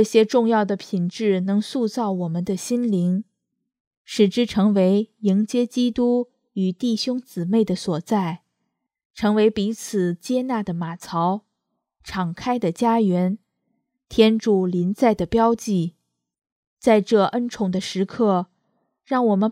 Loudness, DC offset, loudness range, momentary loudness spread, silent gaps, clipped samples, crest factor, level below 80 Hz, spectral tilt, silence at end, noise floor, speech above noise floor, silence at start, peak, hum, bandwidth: -21 LUFS; under 0.1%; 3 LU; 9 LU; 3.80-3.91 s, 3.97-4.05 s, 9.05-9.10 s, 16.52-16.77 s; under 0.1%; 20 dB; -56 dBFS; -6.5 dB/octave; 0 s; -78 dBFS; 58 dB; 0 s; -2 dBFS; none; 15 kHz